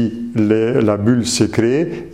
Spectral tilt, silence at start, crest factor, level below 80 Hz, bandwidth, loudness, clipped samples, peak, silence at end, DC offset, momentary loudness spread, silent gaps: -5.5 dB/octave; 0 s; 14 dB; -48 dBFS; 15 kHz; -16 LUFS; under 0.1%; 0 dBFS; 0 s; 0.4%; 4 LU; none